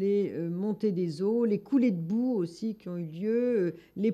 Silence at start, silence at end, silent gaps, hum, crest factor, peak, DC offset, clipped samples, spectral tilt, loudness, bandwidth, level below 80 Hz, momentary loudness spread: 0 s; 0 s; none; none; 12 dB; -16 dBFS; under 0.1%; under 0.1%; -9 dB/octave; -30 LUFS; 13 kHz; -74 dBFS; 8 LU